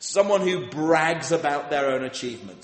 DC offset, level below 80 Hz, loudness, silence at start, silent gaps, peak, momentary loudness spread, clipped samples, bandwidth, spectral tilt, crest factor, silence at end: under 0.1%; -66 dBFS; -23 LUFS; 0 s; none; -6 dBFS; 9 LU; under 0.1%; 8.8 kHz; -4 dB/octave; 18 dB; 0.05 s